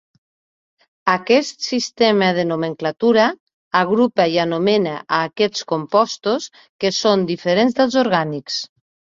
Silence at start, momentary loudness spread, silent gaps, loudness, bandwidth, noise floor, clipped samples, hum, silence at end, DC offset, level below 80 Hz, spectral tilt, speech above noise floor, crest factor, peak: 1.05 s; 8 LU; 3.40-3.47 s, 3.53-3.71 s, 6.69-6.79 s; -18 LUFS; 7.8 kHz; under -90 dBFS; under 0.1%; none; 0.55 s; under 0.1%; -62 dBFS; -4.5 dB/octave; over 72 dB; 18 dB; -2 dBFS